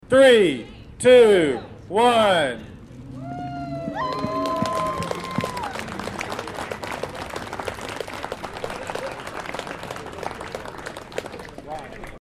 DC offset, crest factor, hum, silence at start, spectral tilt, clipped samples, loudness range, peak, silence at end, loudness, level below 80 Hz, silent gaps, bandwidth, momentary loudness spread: under 0.1%; 18 dB; none; 0.05 s; -4.5 dB/octave; under 0.1%; 13 LU; -4 dBFS; 0 s; -22 LUFS; -50 dBFS; none; 14.5 kHz; 20 LU